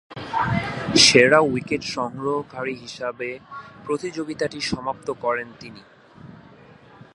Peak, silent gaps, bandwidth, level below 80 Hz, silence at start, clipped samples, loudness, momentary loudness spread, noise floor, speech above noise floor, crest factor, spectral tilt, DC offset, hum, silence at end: 0 dBFS; none; 11.5 kHz; -52 dBFS; 0.1 s; under 0.1%; -21 LUFS; 20 LU; -48 dBFS; 26 dB; 22 dB; -3 dB/octave; under 0.1%; none; 0.8 s